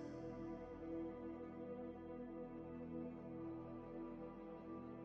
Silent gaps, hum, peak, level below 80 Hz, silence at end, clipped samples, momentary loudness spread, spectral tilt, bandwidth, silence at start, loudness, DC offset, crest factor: none; none; -38 dBFS; -68 dBFS; 0 s; under 0.1%; 4 LU; -8 dB/octave; 6.6 kHz; 0 s; -52 LUFS; under 0.1%; 12 dB